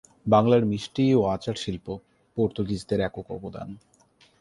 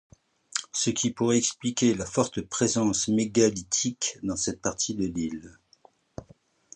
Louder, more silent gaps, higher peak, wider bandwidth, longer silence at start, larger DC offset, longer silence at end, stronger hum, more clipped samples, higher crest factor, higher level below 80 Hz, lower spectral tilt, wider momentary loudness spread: about the same, -25 LUFS vs -26 LUFS; neither; about the same, -6 dBFS vs -6 dBFS; first, 11.5 kHz vs 9.8 kHz; second, 0.25 s vs 0.55 s; neither; first, 0.65 s vs 0.5 s; neither; neither; about the same, 18 dB vs 22 dB; about the same, -52 dBFS vs -56 dBFS; first, -7 dB/octave vs -3.5 dB/octave; first, 17 LU vs 10 LU